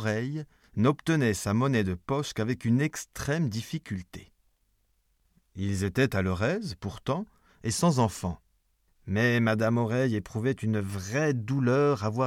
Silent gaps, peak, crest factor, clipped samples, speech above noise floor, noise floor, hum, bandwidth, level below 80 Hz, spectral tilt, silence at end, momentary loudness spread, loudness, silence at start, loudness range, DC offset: none; -8 dBFS; 20 dB; under 0.1%; 44 dB; -71 dBFS; none; 16 kHz; -56 dBFS; -6 dB/octave; 0 s; 12 LU; -28 LUFS; 0 s; 5 LU; under 0.1%